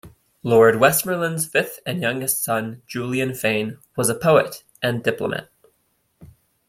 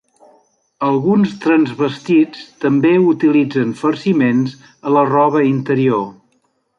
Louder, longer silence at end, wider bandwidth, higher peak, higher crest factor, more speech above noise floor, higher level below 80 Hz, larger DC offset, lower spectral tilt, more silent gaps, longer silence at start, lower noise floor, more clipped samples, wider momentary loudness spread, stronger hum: second, -20 LUFS vs -15 LUFS; second, 0.4 s vs 0.65 s; first, 16.5 kHz vs 7.6 kHz; about the same, -2 dBFS vs -2 dBFS; first, 20 dB vs 12 dB; about the same, 47 dB vs 48 dB; about the same, -58 dBFS vs -62 dBFS; neither; second, -4 dB/octave vs -8 dB/octave; neither; second, 0.05 s vs 0.8 s; first, -67 dBFS vs -63 dBFS; neither; first, 13 LU vs 8 LU; neither